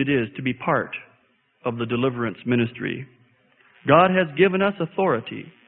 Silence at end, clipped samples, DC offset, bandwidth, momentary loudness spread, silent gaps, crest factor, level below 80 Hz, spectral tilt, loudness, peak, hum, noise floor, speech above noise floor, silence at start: 0.2 s; under 0.1%; under 0.1%; 4.1 kHz; 14 LU; none; 20 dB; -60 dBFS; -11 dB/octave; -22 LUFS; -2 dBFS; none; -63 dBFS; 41 dB; 0 s